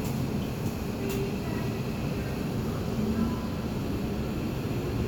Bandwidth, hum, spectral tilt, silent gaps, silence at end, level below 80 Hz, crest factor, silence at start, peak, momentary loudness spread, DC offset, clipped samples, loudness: over 20 kHz; none; -6.5 dB/octave; none; 0 s; -42 dBFS; 12 dB; 0 s; -18 dBFS; 3 LU; under 0.1%; under 0.1%; -31 LUFS